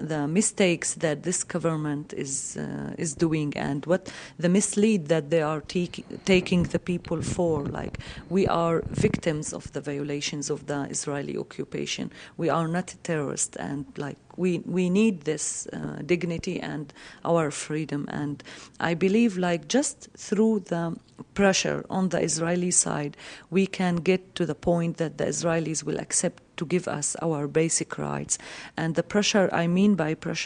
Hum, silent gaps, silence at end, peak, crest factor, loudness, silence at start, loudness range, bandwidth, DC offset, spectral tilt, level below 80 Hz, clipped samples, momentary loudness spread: none; none; 0 s; -6 dBFS; 20 dB; -26 LUFS; 0 s; 4 LU; 10.5 kHz; under 0.1%; -4.5 dB/octave; -54 dBFS; under 0.1%; 11 LU